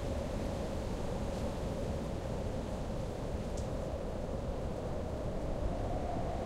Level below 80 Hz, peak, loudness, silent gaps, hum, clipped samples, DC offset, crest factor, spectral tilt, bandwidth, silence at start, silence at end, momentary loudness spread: -42 dBFS; -24 dBFS; -39 LUFS; none; none; under 0.1%; under 0.1%; 12 dB; -7 dB/octave; 15 kHz; 0 s; 0 s; 2 LU